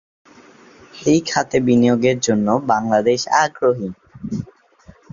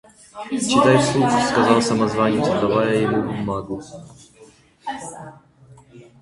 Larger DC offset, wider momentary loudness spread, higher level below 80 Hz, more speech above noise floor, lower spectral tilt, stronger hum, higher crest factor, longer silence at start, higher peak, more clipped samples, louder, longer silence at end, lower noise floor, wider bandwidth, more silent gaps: neither; second, 14 LU vs 19 LU; about the same, -54 dBFS vs -52 dBFS; about the same, 31 dB vs 30 dB; about the same, -5 dB/octave vs -5 dB/octave; neither; about the same, 16 dB vs 20 dB; first, 0.95 s vs 0.35 s; about the same, -2 dBFS vs -2 dBFS; neither; about the same, -18 LUFS vs -18 LUFS; first, 0.7 s vs 0.2 s; about the same, -48 dBFS vs -50 dBFS; second, 7.6 kHz vs 11.5 kHz; neither